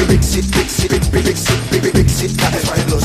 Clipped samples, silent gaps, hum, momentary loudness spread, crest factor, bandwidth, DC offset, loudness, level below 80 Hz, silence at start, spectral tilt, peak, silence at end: under 0.1%; none; none; 3 LU; 14 dB; 15.5 kHz; under 0.1%; -15 LUFS; -22 dBFS; 0 s; -4.5 dB/octave; 0 dBFS; 0 s